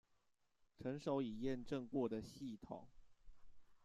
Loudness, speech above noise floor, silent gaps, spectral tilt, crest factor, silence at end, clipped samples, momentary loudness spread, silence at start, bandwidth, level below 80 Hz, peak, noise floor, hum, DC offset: -46 LUFS; 35 dB; none; -7 dB/octave; 18 dB; 0.05 s; under 0.1%; 11 LU; 0.8 s; 13 kHz; -68 dBFS; -30 dBFS; -79 dBFS; none; under 0.1%